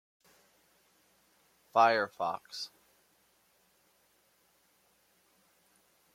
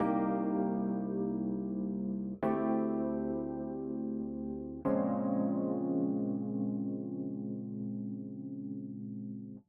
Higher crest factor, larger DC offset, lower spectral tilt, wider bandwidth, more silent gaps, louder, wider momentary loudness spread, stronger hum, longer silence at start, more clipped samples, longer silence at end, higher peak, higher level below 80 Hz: first, 26 dB vs 16 dB; neither; second, -3.5 dB/octave vs -10.5 dB/octave; first, 16.5 kHz vs 3.3 kHz; neither; first, -31 LUFS vs -36 LUFS; first, 16 LU vs 10 LU; neither; first, 1.75 s vs 0 s; neither; first, 3.45 s vs 0.05 s; first, -12 dBFS vs -20 dBFS; second, -86 dBFS vs -64 dBFS